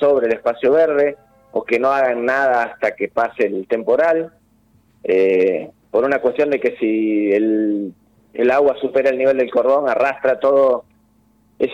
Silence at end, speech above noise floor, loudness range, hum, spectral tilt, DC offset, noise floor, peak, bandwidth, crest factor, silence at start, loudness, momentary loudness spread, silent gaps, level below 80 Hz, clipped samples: 0 s; 40 dB; 2 LU; none; -6.5 dB/octave; under 0.1%; -56 dBFS; -6 dBFS; 7.8 kHz; 10 dB; 0 s; -17 LUFS; 7 LU; none; -60 dBFS; under 0.1%